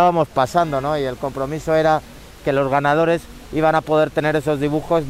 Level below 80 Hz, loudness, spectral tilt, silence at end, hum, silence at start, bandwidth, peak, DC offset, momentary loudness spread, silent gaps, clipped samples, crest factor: -44 dBFS; -19 LUFS; -6.5 dB/octave; 0 s; none; 0 s; 16 kHz; -2 dBFS; under 0.1%; 8 LU; none; under 0.1%; 16 dB